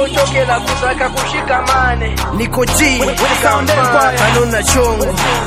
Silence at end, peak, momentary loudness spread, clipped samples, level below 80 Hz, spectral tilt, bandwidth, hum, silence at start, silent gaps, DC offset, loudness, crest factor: 0 s; 0 dBFS; 5 LU; under 0.1%; -24 dBFS; -3.5 dB/octave; 16 kHz; none; 0 s; none; under 0.1%; -13 LUFS; 12 dB